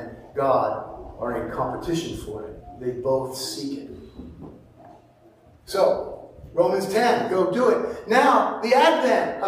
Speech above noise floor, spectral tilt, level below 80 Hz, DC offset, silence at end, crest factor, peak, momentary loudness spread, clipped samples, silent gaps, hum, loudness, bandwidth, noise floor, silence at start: 31 dB; -4.5 dB/octave; -50 dBFS; under 0.1%; 0 s; 20 dB; -4 dBFS; 20 LU; under 0.1%; none; none; -23 LUFS; 15.5 kHz; -54 dBFS; 0 s